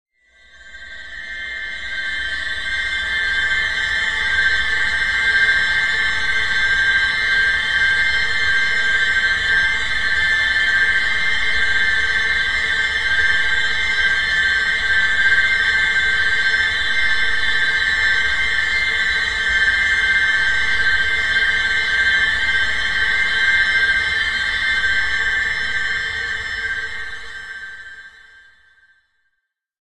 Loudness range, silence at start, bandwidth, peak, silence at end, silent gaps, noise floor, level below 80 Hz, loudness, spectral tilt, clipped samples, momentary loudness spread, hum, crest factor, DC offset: 6 LU; 0.6 s; 12 kHz; -4 dBFS; 1.7 s; none; -75 dBFS; -40 dBFS; -16 LUFS; -1 dB/octave; under 0.1%; 8 LU; none; 14 dB; under 0.1%